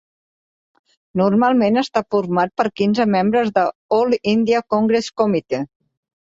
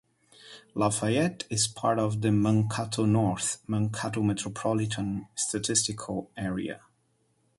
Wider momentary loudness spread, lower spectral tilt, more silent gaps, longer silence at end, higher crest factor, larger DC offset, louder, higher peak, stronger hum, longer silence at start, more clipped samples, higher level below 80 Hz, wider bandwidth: second, 5 LU vs 10 LU; first, -6.5 dB/octave vs -4.5 dB/octave; first, 3.75-3.89 s vs none; second, 0.55 s vs 0.8 s; about the same, 16 dB vs 20 dB; neither; first, -18 LUFS vs -28 LUFS; first, -2 dBFS vs -8 dBFS; neither; first, 1.15 s vs 0.45 s; neither; about the same, -60 dBFS vs -58 dBFS; second, 7.8 kHz vs 11.5 kHz